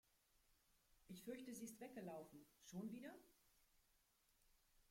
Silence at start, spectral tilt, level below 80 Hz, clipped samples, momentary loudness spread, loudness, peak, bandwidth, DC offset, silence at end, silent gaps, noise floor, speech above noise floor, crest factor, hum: 0.35 s; -5 dB/octave; -84 dBFS; under 0.1%; 10 LU; -57 LUFS; -40 dBFS; 16.5 kHz; under 0.1%; 0.05 s; none; -81 dBFS; 25 dB; 18 dB; none